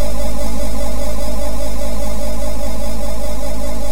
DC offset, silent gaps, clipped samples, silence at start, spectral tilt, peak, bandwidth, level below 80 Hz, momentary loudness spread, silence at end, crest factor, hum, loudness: 50%; none; under 0.1%; 0 s; -5 dB/octave; -2 dBFS; 16 kHz; -24 dBFS; 1 LU; 0 s; 12 dB; none; -24 LUFS